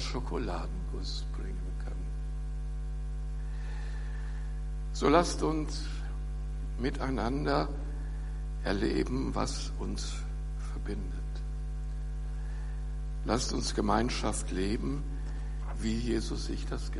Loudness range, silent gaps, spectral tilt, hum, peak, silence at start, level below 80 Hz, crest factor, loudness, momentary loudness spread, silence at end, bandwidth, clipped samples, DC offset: 7 LU; none; -5.5 dB/octave; none; -10 dBFS; 0 s; -36 dBFS; 24 dB; -35 LUFS; 9 LU; 0 s; 11.5 kHz; under 0.1%; under 0.1%